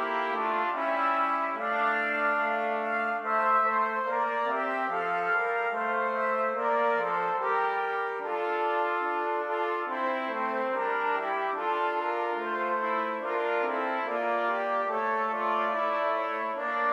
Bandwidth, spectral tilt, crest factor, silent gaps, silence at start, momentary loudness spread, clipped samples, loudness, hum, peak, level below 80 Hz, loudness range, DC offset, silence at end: 13.5 kHz; -5 dB/octave; 14 dB; none; 0 s; 4 LU; under 0.1%; -28 LUFS; none; -14 dBFS; -88 dBFS; 2 LU; under 0.1%; 0 s